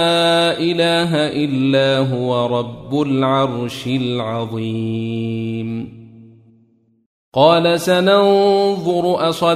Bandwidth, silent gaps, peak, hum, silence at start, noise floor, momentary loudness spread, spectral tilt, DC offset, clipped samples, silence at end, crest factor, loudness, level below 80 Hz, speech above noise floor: 15.5 kHz; 7.06-7.32 s; 0 dBFS; none; 0 s; -56 dBFS; 10 LU; -6 dB/octave; under 0.1%; under 0.1%; 0 s; 16 dB; -16 LUFS; -56 dBFS; 40 dB